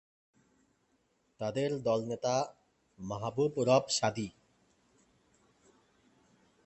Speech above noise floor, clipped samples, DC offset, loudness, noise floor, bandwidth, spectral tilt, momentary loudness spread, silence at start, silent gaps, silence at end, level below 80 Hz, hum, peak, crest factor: 43 dB; under 0.1%; under 0.1%; -33 LUFS; -74 dBFS; 8.8 kHz; -4.5 dB/octave; 14 LU; 1.4 s; none; 2.35 s; -70 dBFS; none; -12 dBFS; 24 dB